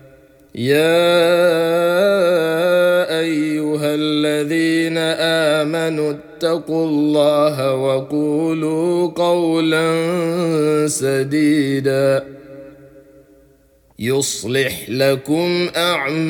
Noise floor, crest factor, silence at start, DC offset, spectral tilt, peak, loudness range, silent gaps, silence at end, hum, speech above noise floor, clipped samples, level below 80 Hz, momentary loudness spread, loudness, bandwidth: -53 dBFS; 14 dB; 0.55 s; under 0.1%; -5 dB/octave; -4 dBFS; 5 LU; none; 0 s; none; 37 dB; under 0.1%; -60 dBFS; 5 LU; -17 LUFS; 19 kHz